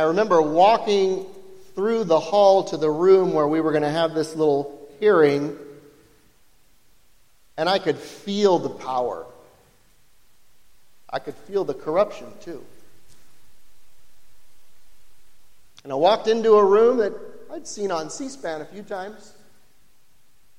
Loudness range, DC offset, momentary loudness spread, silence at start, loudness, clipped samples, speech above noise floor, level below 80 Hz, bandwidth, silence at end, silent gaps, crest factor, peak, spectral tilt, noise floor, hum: 11 LU; under 0.1%; 20 LU; 0 s; -21 LUFS; under 0.1%; 43 dB; -64 dBFS; 12 kHz; 1.3 s; none; 18 dB; -4 dBFS; -5.5 dB/octave; -63 dBFS; none